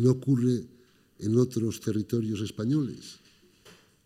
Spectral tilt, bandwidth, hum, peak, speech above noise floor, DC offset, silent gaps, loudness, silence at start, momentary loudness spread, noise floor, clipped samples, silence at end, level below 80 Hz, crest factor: -7.5 dB/octave; 15.5 kHz; none; -12 dBFS; 30 dB; under 0.1%; none; -28 LUFS; 0 s; 13 LU; -57 dBFS; under 0.1%; 0.9 s; -68 dBFS; 18 dB